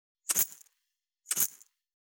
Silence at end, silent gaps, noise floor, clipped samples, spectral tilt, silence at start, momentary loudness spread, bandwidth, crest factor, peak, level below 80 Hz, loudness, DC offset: 0.65 s; none; -84 dBFS; under 0.1%; 1 dB/octave; 0.3 s; 5 LU; over 20 kHz; 26 dB; -10 dBFS; under -90 dBFS; -30 LUFS; under 0.1%